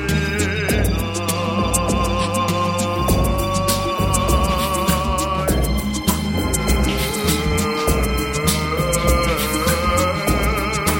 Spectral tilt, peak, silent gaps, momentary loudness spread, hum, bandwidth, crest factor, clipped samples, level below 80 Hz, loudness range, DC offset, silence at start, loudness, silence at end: -4.5 dB/octave; -2 dBFS; none; 3 LU; none; 17 kHz; 16 dB; under 0.1%; -26 dBFS; 1 LU; under 0.1%; 0 s; -19 LUFS; 0 s